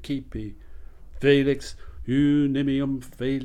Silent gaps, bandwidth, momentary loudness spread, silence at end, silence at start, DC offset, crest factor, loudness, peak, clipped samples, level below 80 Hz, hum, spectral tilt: none; 11 kHz; 18 LU; 0 s; 0 s; under 0.1%; 18 dB; -24 LUFS; -6 dBFS; under 0.1%; -42 dBFS; none; -7 dB/octave